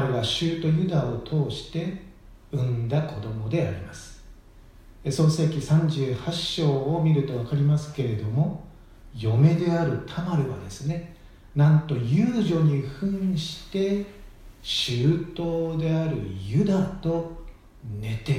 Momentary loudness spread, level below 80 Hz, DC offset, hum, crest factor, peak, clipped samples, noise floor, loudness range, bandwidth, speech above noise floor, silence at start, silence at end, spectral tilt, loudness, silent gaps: 12 LU; -48 dBFS; under 0.1%; none; 18 dB; -6 dBFS; under 0.1%; -49 dBFS; 4 LU; 10.5 kHz; 25 dB; 0 s; 0 s; -7 dB/octave; -25 LUFS; none